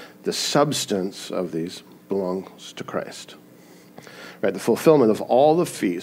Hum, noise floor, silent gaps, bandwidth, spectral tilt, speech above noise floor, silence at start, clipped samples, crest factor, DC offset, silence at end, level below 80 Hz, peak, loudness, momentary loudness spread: none; -48 dBFS; none; 16 kHz; -4.5 dB/octave; 27 dB; 0 s; under 0.1%; 20 dB; under 0.1%; 0 s; -72 dBFS; -2 dBFS; -22 LUFS; 21 LU